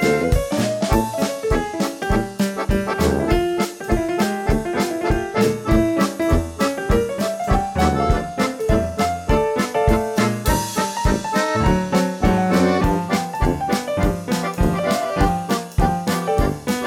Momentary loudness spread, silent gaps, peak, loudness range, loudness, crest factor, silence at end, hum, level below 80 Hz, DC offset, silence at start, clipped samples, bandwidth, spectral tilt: 4 LU; none; -6 dBFS; 2 LU; -20 LUFS; 14 dB; 0 s; none; -28 dBFS; under 0.1%; 0 s; under 0.1%; 17 kHz; -5.5 dB/octave